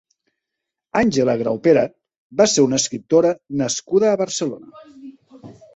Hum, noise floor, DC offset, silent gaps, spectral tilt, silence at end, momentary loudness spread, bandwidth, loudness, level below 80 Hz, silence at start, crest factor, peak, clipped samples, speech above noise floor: none; -82 dBFS; under 0.1%; 2.17-2.30 s; -4 dB/octave; 0.25 s; 9 LU; 8.2 kHz; -18 LUFS; -56 dBFS; 0.95 s; 18 dB; -2 dBFS; under 0.1%; 64 dB